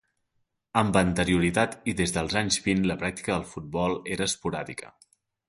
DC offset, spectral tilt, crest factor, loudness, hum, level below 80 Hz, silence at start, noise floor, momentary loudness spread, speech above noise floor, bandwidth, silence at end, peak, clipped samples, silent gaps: under 0.1%; -4.5 dB/octave; 22 dB; -26 LUFS; none; -48 dBFS; 0.75 s; -76 dBFS; 9 LU; 49 dB; 11.5 kHz; 0.6 s; -6 dBFS; under 0.1%; none